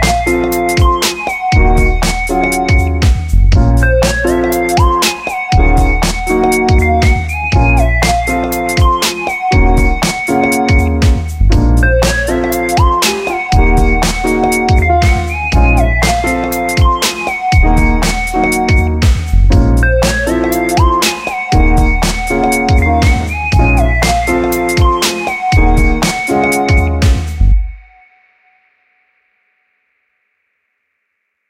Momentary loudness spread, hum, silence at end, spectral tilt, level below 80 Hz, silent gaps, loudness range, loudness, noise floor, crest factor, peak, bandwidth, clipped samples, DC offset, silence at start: 4 LU; none; 3.7 s; -5 dB/octave; -14 dBFS; none; 1 LU; -12 LUFS; -68 dBFS; 10 dB; 0 dBFS; 16.5 kHz; under 0.1%; under 0.1%; 0 s